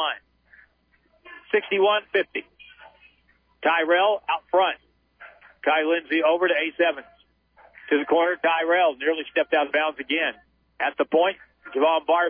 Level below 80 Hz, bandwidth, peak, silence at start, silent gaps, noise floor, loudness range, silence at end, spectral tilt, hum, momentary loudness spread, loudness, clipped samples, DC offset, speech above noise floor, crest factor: -70 dBFS; 5 kHz; -8 dBFS; 0 s; none; -64 dBFS; 3 LU; 0 s; -6.5 dB/octave; none; 8 LU; -23 LUFS; under 0.1%; under 0.1%; 42 dB; 16 dB